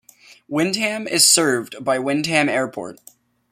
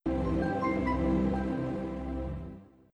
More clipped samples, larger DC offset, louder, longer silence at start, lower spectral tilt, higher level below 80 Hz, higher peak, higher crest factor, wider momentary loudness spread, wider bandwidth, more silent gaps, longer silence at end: neither; neither; first, -18 LUFS vs -31 LUFS; first, 0.3 s vs 0.05 s; second, -2 dB/octave vs -9 dB/octave; second, -66 dBFS vs -40 dBFS; first, 0 dBFS vs -16 dBFS; first, 20 dB vs 14 dB; about the same, 14 LU vs 12 LU; first, 16.5 kHz vs 9.6 kHz; neither; first, 0.6 s vs 0.3 s